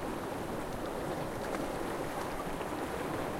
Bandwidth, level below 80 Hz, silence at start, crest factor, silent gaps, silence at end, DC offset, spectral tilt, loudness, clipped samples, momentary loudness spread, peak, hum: 16 kHz; -50 dBFS; 0 s; 16 dB; none; 0 s; under 0.1%; -5 dB/octave; -37 LUFS; under 0.1%; 2 LU; -22 dBFS; none